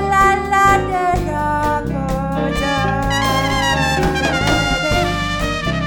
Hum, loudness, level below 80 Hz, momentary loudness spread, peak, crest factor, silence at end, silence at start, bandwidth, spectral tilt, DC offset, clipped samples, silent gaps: none; -16 LUFS; -28 dBFS; 6 LU; 0 dBFS; 16 dB; 0 s; 0 s; 18 kHz; -4.5 dB/octave; under 0.1%; under 0.1%; none